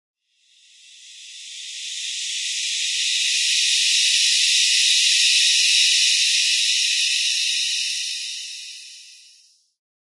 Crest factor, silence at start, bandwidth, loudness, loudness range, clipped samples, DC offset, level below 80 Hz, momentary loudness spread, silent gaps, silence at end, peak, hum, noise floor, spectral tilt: 16 dB; 1 s; 11.5 kHz; -16 LUFS; 8 LU; under 0.1%; under 0.1%; under -90 dBFS; 18 LU; none; 0.9 s; -4 dBFS; none; -59 dBFS; 16 dB/octave